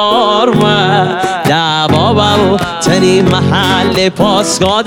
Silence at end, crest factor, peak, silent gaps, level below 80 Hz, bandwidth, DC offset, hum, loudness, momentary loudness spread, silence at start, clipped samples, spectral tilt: 0 s; 10 dB; 0 dBFS; none; -38 dBFS; 18.5 kHz; under 0.1%; none; -10 LUFS; 3 LU; 0 s; under 0.1%; -4.5 dB/octave